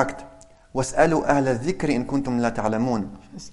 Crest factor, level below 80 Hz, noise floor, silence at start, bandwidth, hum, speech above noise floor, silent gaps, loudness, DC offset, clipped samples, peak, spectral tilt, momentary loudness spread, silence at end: 20 dB; -44 dBFS; -47 dBFS; 0 s; 11.5 kHz; none; 25 dB; none; -23 LUFS; under 0.1%; under 0.1%; -2 dBFS; -6 dB/octave; 12 LU; 0 s